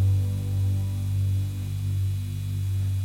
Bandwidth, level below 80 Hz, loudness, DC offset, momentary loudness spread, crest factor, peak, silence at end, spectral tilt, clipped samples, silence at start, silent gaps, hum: 15.5 kHz; -44 dBFS; -27 LUFS; under 0.1%; 4 LU; 10 dB; -14 dBFS; 0 s; -7 dB/octave; under 0.1%; 0 s; none; 50 Hz at -50 dBFS